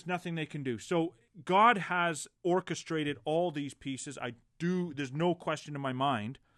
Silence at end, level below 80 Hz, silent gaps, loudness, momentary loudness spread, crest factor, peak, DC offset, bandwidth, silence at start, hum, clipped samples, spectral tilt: 0.2 s; -72 dBFS; none; -32 LUFS; 14 LU; 20 dB; -12 dBFS; under 0.1%; 12.5 kHz; 0.05 s; none; under 0.1%; -5 dB/octave